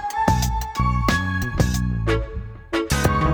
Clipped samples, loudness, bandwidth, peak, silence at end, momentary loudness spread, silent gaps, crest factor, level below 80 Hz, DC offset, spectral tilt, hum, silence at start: under 0.1%; -22 LUFS; over 20 kHz; -4 dBFS; 0 s; 6 LU; none; 18 dB; -28 dBFS; under 0.1%; -5.5 dB/octave; none; 0 s